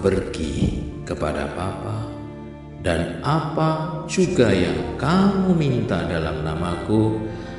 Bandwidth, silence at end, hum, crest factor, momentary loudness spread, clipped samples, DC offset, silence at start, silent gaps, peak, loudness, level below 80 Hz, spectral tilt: 11.5 kHz; 0 s; none; 20 dB; 12 LU; under 0.1%; under 0.1%; 0 s; none; -2 dBFS; -22 LUFS; -38 dBFS; -6.5 dB/octave